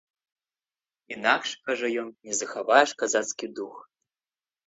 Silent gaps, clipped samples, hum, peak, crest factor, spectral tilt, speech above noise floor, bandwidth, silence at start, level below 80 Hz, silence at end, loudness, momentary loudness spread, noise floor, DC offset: none; under 0.1%; none; -4 dBFS; 26 dB; -1 dB/octave; over 64 dB; 8.2 kHz; 1.1 s; -78 dBFS; 0.85 s; -26 LUFS; 16 LU; under -90 dBFS; under 0.1%